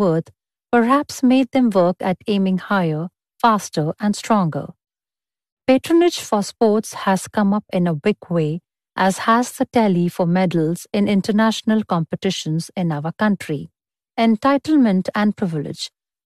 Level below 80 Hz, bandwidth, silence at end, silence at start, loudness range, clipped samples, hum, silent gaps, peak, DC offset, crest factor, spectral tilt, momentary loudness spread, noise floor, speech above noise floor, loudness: -60 dBFS; 13.5 kHz; 0.5 s; 0 s; 2 LU; under 0.1%; none; 5.52-5.57 s; -4 dBFS; under 0.1%; 14 dB; -6 dB/octave; 8 LU; under -90 dBFS; over 72 dB; -19 LUFS